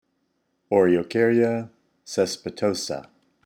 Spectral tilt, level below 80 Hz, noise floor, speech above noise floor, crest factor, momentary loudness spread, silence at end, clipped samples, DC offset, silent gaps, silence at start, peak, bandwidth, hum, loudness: -5 dB/octave; -64 dBFS; -72 dBFS; 50 dB; 18 dB; 12 LU; 0.45 s; under 0.1%; under 0.1%; none; 0.7 s; -6 dBFS; 15.5 kHz; none; -23 LUFS